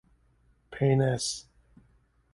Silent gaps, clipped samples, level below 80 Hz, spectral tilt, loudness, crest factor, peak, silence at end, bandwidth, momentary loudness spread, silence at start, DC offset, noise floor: none; under 0.1%; -58 dBFS; -5.5 dB/octave; -28 LUFS; 18 dB; -12 dBFS; 0.95 s; 11.5 kHz; 15 LU; 0.7 s; under 0.1%; -66 dBFS